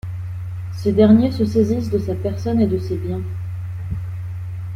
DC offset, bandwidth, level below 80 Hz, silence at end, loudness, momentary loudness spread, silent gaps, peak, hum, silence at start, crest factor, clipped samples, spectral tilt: under 0.1%; 11.5 kHz; -42 dBFS; 0 s; -20 LUFS; 16 LU; none; -2 dBFS; none; 0.05 s; 16 dB; under 0.1%; -9 dB/octave